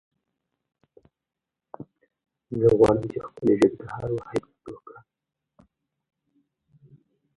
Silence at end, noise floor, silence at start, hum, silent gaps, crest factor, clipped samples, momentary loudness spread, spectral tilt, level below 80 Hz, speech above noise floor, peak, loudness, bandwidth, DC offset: 2.45 s; -87 dBFS; 1.8 s; none; none; 24 dB; under 0.1%; 26 LU; -8 dB/octave; -54 dBFS; 65 dB; -4 dBFS; -23 LUFS; 11.5 kHz; under 0.1%